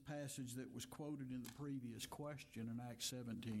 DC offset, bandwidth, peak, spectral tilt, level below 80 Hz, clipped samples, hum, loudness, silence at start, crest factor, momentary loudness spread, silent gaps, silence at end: under 0.1%; 16.5 kHz; -32 dBFS; -4.5 dB/octave; -76 dBFS; under 0.1%; none; -50 LUFS; 0 s; 16 dB; 5 LU; none; 0 s